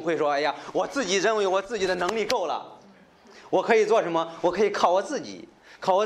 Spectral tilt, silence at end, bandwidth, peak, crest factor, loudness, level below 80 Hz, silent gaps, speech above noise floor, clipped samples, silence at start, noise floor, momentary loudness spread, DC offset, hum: -3.5 dB/octave; 0 s; 15 kHz; -4 dBFS; 20 dB; -25 LUFS; -64 dBFS; none; 29 dB; under 0.1%; 0 s; -53 dBFS; 10 LU; under 0.1%; none